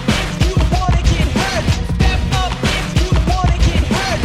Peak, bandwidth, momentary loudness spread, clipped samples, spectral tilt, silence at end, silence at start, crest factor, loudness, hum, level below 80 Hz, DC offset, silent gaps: 0 dBFS; 14 kHz; 2 LU; under 0.1%; -5 dB/octave; 0 s; 0 s; 14 dB; -16 LUFS; none; -18 dBFS; under 0.1%; none